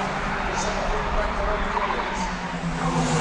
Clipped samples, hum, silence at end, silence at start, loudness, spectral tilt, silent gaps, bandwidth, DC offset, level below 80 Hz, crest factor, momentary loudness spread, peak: under 0.1%; none; 0 s; 0 s; -25 LUFS; -4.5 dB/octave; none; 11 kHz; under 0.1%; -32 dBFS; 14 dB; 3 LU; -10 dBFS